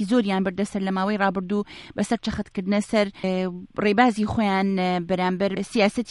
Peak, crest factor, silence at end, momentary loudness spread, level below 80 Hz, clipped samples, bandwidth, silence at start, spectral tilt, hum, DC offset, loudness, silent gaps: -4 dBFS; 20 dB; 0 s; 8 LU; -50 dBFS; under 0.1%; 11.5 kHz; 0 s; -6 dB/octave; none; under 0.1%; -24 LUFS; none